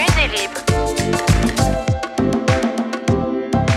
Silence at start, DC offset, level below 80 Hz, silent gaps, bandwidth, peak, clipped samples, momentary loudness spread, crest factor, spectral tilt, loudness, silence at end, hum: 0 s; under 0.1%; -28 dBFS; none; 15.5 kHz; -2 dBFS; under 0.1%; 4 LU; 16 dB; -5 dB/octave; -18 LUFS; 0 s; none